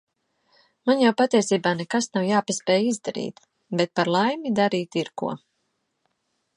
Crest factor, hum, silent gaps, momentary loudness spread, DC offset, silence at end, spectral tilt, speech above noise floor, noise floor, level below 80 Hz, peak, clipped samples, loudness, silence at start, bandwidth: 18 dB; none; none; 11 LU; under 0.1%; 1.2 s; -4.5 dB/octave; 52 dB; -74 dBFS; -72 dBFS; -6 dBFS; under 0.1%; -23 LUFS; 0.85 s; 11.5 kHz